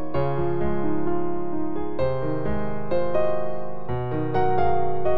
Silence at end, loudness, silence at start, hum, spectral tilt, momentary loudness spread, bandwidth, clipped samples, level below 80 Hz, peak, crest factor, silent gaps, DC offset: 0 s; -26 LUFS; 0 s; none; -10.5 dB/octave; 6 LU; 5.8 kHz; under 0.1%; -42 dBFS; -8 dBFS; 16 dB; none; 8%